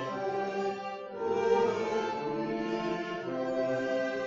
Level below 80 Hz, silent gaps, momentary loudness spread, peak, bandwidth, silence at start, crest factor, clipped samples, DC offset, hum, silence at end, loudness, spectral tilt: -68 dBFS; none; 7 LU; -14 dBFS; 7.6 kHz; 0 s; 16 dB; under 0.1%; under 0.1%; none; 0 s; -32 LUFS; -4 dB/octave